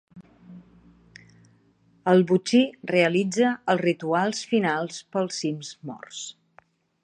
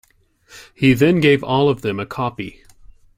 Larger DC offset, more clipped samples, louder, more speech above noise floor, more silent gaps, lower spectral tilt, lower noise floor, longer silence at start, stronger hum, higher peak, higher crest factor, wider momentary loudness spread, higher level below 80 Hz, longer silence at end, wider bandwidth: neither; neither; second, -23 LUFS vs -17 LUFS; about the same, 38 dB vs 37 dB; neither; second, -5 dB/octave vs -7 dB/octave; first, -61 dBFS vs -54 dBFS; second, 0.15 s vs 0.55 s; neither; second, -6 dBFS vs -2 dBFS; about the same, 20 dB vs 18 dB; first, 16 LU vs 12 LU; second, -70 dBFS vs -48 dBFS; about the same, 0.75 s vs 0.65 s; second, 10 kHz vs 16 kHz